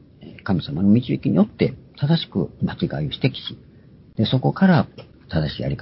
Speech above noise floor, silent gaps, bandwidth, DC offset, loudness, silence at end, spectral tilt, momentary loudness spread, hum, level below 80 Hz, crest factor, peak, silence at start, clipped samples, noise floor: 28 dB; none; 5.8 kHz; under 0.1%; -21 LUFS; 0 s; -11.5 dB/octave; 10 LU; none; -44 dBFS; 18 dB; -4 dBFS; 0.2 s; under 0.1%; -48 dBFS